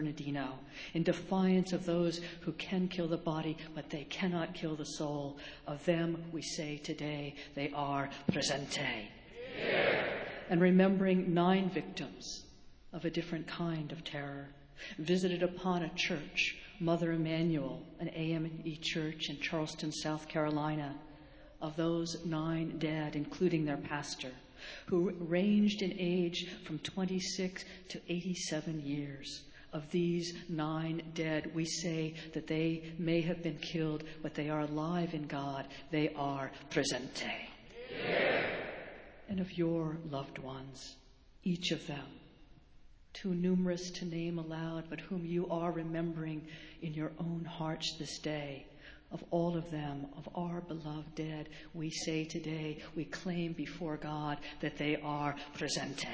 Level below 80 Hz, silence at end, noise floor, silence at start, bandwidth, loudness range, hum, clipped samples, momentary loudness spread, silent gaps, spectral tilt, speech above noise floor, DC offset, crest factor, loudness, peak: -62 dBFS; 0 s; -59 dBFS; 0 s; 8 kHz; 7 LU; none; under 0.1%; 12 LU; none; -5.5 dB/octave; 23 dB; under 0.1%; 22 dB; -37 LUFS; -14 dBFS